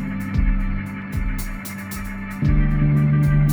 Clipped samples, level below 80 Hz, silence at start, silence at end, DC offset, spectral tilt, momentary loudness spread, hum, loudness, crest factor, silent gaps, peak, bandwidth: under 0.1%; -24 dBFS; 0 s; 0 s; under 0.1%; -7.5 dB/octave; 13 LU; none; -22 LUFS; 14 dB; none; -6 dBFS; over 20 kHz